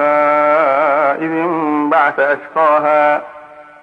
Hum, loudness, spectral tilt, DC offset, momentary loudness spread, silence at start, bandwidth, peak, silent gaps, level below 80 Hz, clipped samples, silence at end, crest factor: none; -13 LUFS; -7 dB/octave; under 0.1%; 5 LU; 0 s; 5.4 kHz; -2 dBFS; none; -66 dBFS; under 0.1%; 0.2 s; 12 dB